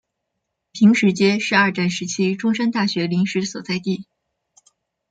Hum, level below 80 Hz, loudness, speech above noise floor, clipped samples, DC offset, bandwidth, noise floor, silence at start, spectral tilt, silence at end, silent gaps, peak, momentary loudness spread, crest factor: none; -64 dBFS; -19 LUFS; 59 dB; under 0.1%; under 0.1%; 9.2 kHz; -78 dBFS; 0.75 s; -5 dB/octave; 1.1 s; none; -2 dBFS; 10 LU; 18 dB